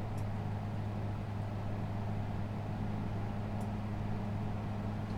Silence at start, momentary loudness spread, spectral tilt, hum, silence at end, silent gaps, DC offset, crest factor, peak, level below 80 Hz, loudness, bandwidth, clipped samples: 0 s; 1 LU; -8.5 dB/octave; none; 0 s; none; under 0.1%; 12 dB; -26 dBFS; -48 dBFS; -39 LUFS; 8.8 kHz; under 0.1%